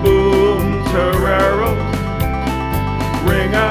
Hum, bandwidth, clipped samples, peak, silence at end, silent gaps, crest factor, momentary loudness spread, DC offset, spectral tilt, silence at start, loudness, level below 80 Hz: none; 16 kHz; under 0.1%; -2 dBFS; 0 s; none; 14 dB; 6 LU; under 0.1%; -6.5 dB/octave; 0 s; -16 LUFS; -24 dBFS